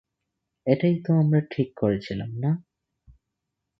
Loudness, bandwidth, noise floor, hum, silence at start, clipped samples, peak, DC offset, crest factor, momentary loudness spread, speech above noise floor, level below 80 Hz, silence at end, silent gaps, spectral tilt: -25 LUFS; 6 kHz; -82 dBFS; none; 0.65 s; under 0.1%; -6 dBFS; under 0.1%; 20 dB; 10 LU; 59 dB; -58 dBFS; 1.2 s; none; -10 dB/octave